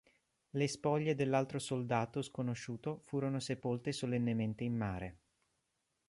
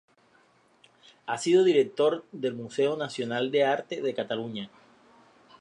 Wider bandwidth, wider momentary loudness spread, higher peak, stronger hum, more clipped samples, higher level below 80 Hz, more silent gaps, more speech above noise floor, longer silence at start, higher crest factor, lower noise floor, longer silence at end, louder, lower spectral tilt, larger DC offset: about the same, 11.5 kHz vs 11 kHz; second, 8 LU vs 14 LU; second, -20 dBFS vs -10 dBFS; neither; neither; first, -66 dBFS vs -78 dBFS; neither; first, 47 dB vs 36 dB; second, 0.55 s vs 1.25 s; about the same, 18 dB vs 18 dB; first, -84 dBFS vs -63 dBFS; about the same, 0.9 s vs 0.95 s; second, -38 LUFS vs -27 LUFS; about the same, -6 dB/octave vs -5 dB/octave; neither